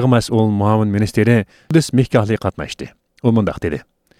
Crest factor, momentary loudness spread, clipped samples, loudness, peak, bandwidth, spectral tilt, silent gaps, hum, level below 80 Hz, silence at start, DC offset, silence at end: 16 dB; 13 LU; under 0.1%; -16 LUFS; -2 dBFS; 14.5 kHz; -7 dB/octave; none; none; -42 dBFS; 0 s; under 0.1%; 0.4 s